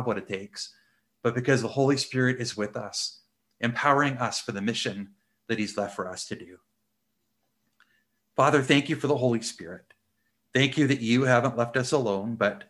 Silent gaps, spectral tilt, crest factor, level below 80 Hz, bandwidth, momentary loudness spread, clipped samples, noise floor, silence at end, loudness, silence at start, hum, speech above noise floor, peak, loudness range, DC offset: none; -5 dB/octave; 22 dB; -66 dBFS; 12.5 kHz; 14 LU; under 0.1%; -78 dBFS; 0.05 s; -26 LUFS; 0 s; none; 52 dB; -6 dBFS; 8 LU; under 0.1%